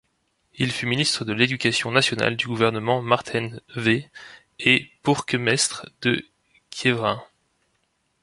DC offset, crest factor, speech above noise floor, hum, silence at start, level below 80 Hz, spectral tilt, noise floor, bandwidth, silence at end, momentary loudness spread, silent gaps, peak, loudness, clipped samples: under 0.1%; 22 dB; 47 dB; none; 0.55 s; -60 dBFS; -4 dB/octave; -70 dBFS; 11.5 kHz; 1 s; 9 LU; none; -2 dBFS; -22 LUFS; under 0.1%